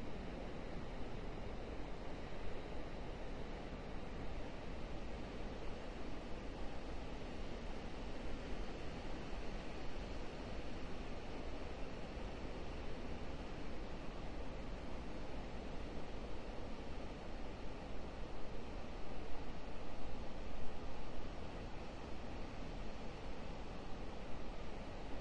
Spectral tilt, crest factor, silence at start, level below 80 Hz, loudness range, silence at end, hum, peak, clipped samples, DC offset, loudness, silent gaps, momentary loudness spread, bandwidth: -6 dB/octave; 16 dB; 0 s; -50 dBFS; 2 LU; 0 s; none; -26 dBFS; under 0.1%; under 0.1%; -50 LUFS; none; 2 LU; 9 kHz